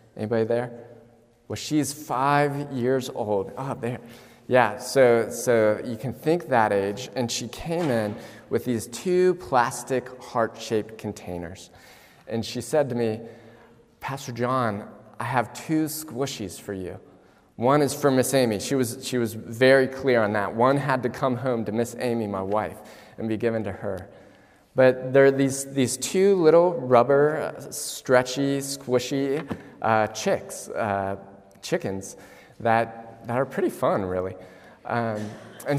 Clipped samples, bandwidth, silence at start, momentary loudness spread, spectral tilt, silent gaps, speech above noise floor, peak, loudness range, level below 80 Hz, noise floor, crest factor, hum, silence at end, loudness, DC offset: under 0.1%; 16 kHz; 0.15 s; 15 LU; -5 dB/octave; none; 31 dB; -2 dBFS; 7 LU; -62 dBFS; -55 dBFS; 22 dB; none; 0 s; -24 LUFS; under 0.1%